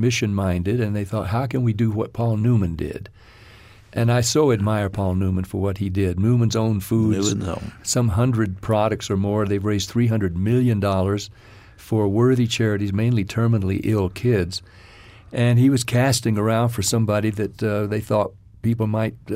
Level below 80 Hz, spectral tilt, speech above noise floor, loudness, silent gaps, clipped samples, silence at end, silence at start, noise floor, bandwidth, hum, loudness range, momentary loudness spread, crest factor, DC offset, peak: -46 dBFS; -6 dB/octave; 26 dB; -21 LUFS; none; under 0.1%; 0 s; 0 s; -46 dBFS; 15.5 kHz; none; 2 LU; 7 LU; 14 dB; under 0.1%; -6 dBFS